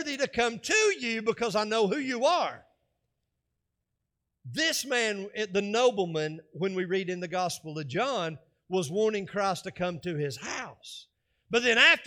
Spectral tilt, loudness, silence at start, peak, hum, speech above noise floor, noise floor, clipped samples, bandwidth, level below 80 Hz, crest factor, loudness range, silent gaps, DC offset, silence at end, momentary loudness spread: -3 dB/octave; -28 LUFS; 0 s; -8 dBFS; none; 55 dB; -83 dBFS; under 0.1%; 17 kHz; -68 dBFS; 22 dB; 4 LU; none; under 0.1%; 0 s; 12 LU